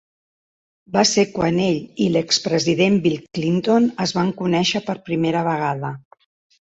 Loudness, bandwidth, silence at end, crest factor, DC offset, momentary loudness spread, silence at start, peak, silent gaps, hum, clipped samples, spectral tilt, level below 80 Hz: -19 LUFS; 8.2 kHz; 0.65 s; 16 dB; under 0.1%; 7 LU; 0.9 s; -4 dBFS; none; none; under 0.1%; -4.5 dB/octave; -56 dBFS